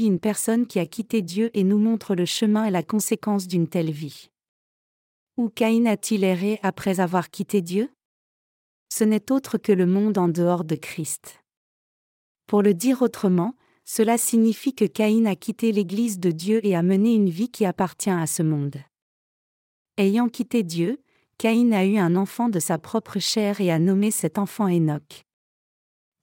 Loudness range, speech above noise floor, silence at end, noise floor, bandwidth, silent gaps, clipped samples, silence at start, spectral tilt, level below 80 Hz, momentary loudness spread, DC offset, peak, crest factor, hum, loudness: 4 LU; over 68 dB; 1.05 s; under -90 dBFS; 17 kHz; 4.48-5.27 s, 8.05-8.86 s, 11.57-12.35 s, 19.02-19.85 s; under 0.1%; 0 s; -5.5 dB/octave; -70 dBFS; 8 LU; under 0.1%; -6 dBFS; 16 dB; none; -22 LUFS